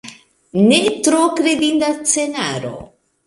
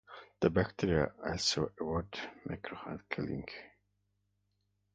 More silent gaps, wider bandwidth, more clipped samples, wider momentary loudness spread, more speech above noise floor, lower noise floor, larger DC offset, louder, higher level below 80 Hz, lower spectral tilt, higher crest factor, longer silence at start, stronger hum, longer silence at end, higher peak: neither; first, 11.5 kHz vs 7.6 kHz; neither; about the same, 13 LU vs 12 LU; second, 25 dB vs 44 dB; second, -40 dBFS vs -79 dBFS; neither; first, -16 LUFS vs -35 LUFS; about the same, -56 dBFS vs -54 dBFS; about the same, -3.5 dB/octave vs -4.5 dB/octave; second, 16 dB vs 22 dB; about the same, 0.05 s vs 0.1 s; second, none vs 50 Hz at -60 dBFS; second, 0.4 s vs 1.3 s; first, 0 dBFS vs -14 dBFS